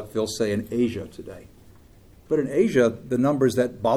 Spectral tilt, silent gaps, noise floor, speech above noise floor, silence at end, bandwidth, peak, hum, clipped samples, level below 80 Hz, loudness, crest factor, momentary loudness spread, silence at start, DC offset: -6 dB/octave; none; -51 dBFS; 28 dB; 0 s; 15.5 kHz; -6 dBFS; none; under 0.1%; -54 dBFS; -23 LUFS; 18 dB; 15 LU; 0 s; under 0.1%